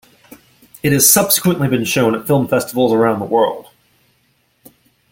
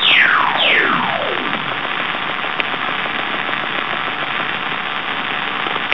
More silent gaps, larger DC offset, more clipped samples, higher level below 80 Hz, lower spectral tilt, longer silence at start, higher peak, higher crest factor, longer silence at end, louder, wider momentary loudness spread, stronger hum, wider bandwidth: neither; second, under 0.1% vs 2%; neither; first, -52 dBFS vs -58 dBFS; about the same, -4 dB/octave vs -4.5 dB/octave; first, 0.85 s vs 0 s; about the same, 0 dBFS vs 0 dBFS; about the same, 16 dB vs 18 dB; first, 1.5 s vs 0 s; first, -14 LUFS vs -17 LUFS; about the same, 8 LU vs 8 LU; neither; first, 17 kHz vs 5.4 kHz